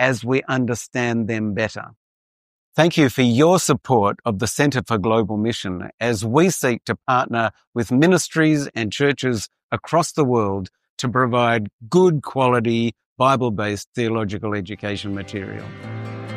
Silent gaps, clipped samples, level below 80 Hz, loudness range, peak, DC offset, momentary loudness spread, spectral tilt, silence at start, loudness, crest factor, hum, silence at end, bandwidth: 1.97-2.72 s, 5.94-5.98 s, 7.67-7.73 s, 9.63-9.69 s, 10.89-10.97 s, 11.73-11.79 s, 13.06-13.16 s, 13.87-13.93 s; under 0.1%; -56 dBFS; 3 LU; -2 dBFS; under 0.1%; 11 LU; -5.5 dB/octave; 0 s; -20 LUFS; 18 dB; none; 0 s; 15.5 kHz